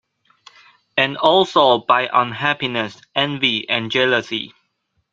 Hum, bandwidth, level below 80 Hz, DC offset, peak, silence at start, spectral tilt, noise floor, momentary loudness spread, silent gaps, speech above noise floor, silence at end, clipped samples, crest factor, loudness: none; 7.6 kHz; -62 dBFS; under 0.1%; 0 dBFS; 0.95 s; -4.5 dB/octave; -69 dBFS; 10 LU; none; 51 dB; 0.65 s; under 0.1%; 20 dB; -17 LUFS